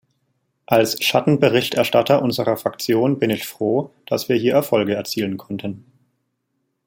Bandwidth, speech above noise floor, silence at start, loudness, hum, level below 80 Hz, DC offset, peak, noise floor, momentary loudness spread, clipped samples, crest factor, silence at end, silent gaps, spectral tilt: 17 kHz; 54 dB; 0.7 s; -19 LUFS; none; -62 dBFS; under 0.1%; -2 dBFS; -73 dBFS; 9 LU; under 0.1%; 18 dB; 1.1 s; none; -5 dB/octave